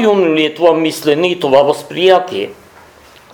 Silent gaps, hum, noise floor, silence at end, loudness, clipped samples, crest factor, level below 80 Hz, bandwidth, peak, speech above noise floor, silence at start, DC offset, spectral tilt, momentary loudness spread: none; none; -41 dBFS; 0.8 s; -12 LUFS; 0.1%; 12 dB; -56 dBFS; 19.5 kHz; 0 dBFS; 30 dB; 0 s; under 0.1%; -5 dB/octave; 8 LU